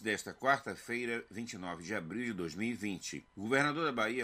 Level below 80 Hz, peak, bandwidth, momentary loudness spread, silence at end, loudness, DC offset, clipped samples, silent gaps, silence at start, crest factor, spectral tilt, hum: -70 dBFS; -16 dBFS; 15.5 kHz; 11 LU; 0 s; -36 LUFS; under 0.1%; under 0.1%; none; 0 s; 20 dB; -4 dB/octave; none